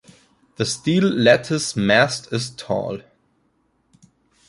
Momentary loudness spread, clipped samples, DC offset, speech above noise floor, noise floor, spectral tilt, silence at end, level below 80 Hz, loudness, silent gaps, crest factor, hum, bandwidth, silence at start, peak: 11 LU; under 0.1%; under 0.1%; 46 dB; -65 dBFS; -4.5 dB/octave; 1.5 s; -56 dBFS; -19 LUFS; none; 20 dB; none; 11.5 kHz; 0.6 s; -2 dBFS